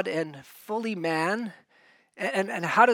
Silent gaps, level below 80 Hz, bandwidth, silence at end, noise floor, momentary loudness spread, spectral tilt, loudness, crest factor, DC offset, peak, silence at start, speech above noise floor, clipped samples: none; -84 dBFS; 18 kHz; 0 s; -61 dBFS; 10 LU; -5 dB/octave; -28 LUFS; 22 dB; under 0.1%; -6 dBFS; 0 s; 35 dB; under 0.1%